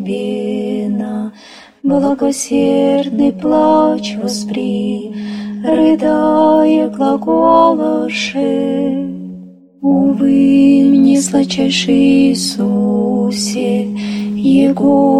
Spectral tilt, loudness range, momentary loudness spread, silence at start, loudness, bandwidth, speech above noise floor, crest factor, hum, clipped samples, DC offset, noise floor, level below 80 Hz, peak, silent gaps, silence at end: -5.5 dB/octave; 4 LU; 10 LU; 0 s; -13 LUFS; 12.5 kHz; 27 dB; 12 dB; none; under 0.1%; under 0.1%; -39 dBFS; -50 dBFS; 0 dBFS; none; 0 s